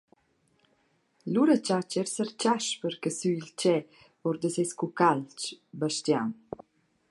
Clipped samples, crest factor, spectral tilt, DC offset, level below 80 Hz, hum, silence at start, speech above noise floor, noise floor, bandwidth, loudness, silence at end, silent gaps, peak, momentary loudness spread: under 0.1%; 20 dB; -4.5 dB/octave; under 0.1%; -76 dBFS; none; 1.25 s; 42 dB; -70 dBFS; 11.5 kHz; -29 LUFS; 0.8 s; none; -8 dBFS; 12 LU